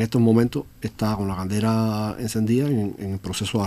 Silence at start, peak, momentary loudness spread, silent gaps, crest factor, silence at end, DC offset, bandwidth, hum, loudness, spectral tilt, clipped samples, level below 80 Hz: 0 s; -6 dBFS; 10 LU; none; 16 dB; 0 s; under 0.1%; 15.5 kHz; none; -23 LUFS; -6.5 dB/octave; under 0.1%; -48 dBFS